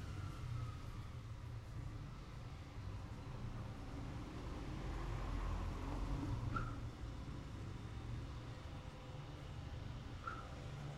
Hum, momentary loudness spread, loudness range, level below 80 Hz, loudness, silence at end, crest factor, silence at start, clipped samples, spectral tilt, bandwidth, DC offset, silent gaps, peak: none; 7 LU; 4 LU; -50 dBFS; -49 LUFS; 0 s; 16 dB; 0 s; under 0.1%; -6.5 dB/octave; 13 kHz; under 0.1%; none; -30 dBFS